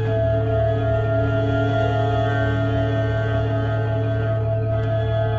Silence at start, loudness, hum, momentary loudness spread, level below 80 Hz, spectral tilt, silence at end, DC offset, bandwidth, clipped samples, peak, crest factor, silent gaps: 0 s; -21 LUFS; none; 2 LU; -34 dBFS; -9 dB/octave; 0 s; under 0.1%; 4.7 kHz; under 0.1%; -8 dBFS; 12 dB; none